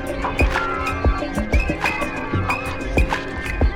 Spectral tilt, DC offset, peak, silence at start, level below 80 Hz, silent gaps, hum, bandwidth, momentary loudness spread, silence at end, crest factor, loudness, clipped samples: -6 dB/octave; under 0.1%; -4 dBFS; 0 s; -24 dBFS; none; none; 16 kHz; 4 LU; 0 s; 16 dB; -22 LUFS; under 0.1%